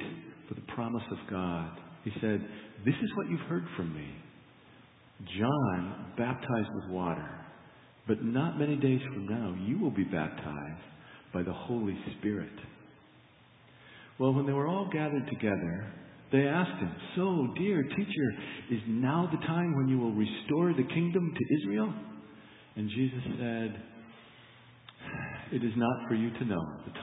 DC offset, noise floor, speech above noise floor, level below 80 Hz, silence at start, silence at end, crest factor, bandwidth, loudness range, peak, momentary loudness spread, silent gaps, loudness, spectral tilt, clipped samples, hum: under 0.1%; -59 dBFS; 28 dB; -62 dBFS; 0 s; 0 s; 20 dB; 4 kHz; 6 LU; -12 dBFS; 17 LU; none; -33 LUFS; -11 dB/octave; under 0.1%; none